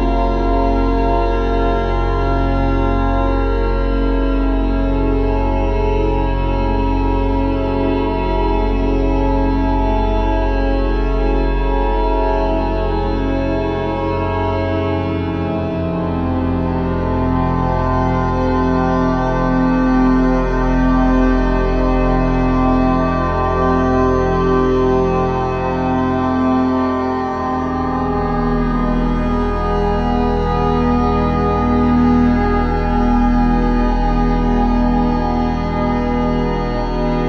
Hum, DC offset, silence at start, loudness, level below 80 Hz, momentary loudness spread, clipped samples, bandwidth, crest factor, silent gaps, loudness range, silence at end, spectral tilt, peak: none; under 0.1%; 0 s; -17 LUFS; -20 dBFS; 4 LU; under 0.1%; 6.4 kHz; 14 dB; none; 3 LU; 0 s; -8.5 dB/octave; -2 dBFS